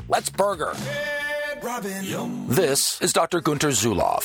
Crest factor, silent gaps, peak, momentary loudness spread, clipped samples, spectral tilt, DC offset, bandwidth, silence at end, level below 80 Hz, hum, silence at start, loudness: 20 dB; none; -4 dBFS; 9 LU; under 0.1%; -3.5 dB/octave; under 0.1%; 19.5 kHz; 0 s; -50 dBFS; none; 0 s; -23 LUFS